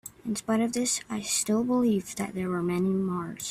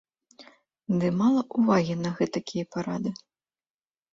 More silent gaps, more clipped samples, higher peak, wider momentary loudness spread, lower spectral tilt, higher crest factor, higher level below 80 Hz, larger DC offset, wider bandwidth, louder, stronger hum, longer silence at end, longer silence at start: neither; neither; second, -14 dBFS vs -10 dBFS; about the same, 8 LU vs 10 LU; second, -4.5 dB/octave vs -7 dB/octave; about the same, 14 dB vs 18 dB; about the same, -62 dBFS vs -64 dBFS; neither; first, 16 kHz vs 7.8 kHz; about the same, -28 LUFS vs -26 LUFS; neither; second, 0 s vs 1 s; second, 0.05 s vs 0.4 s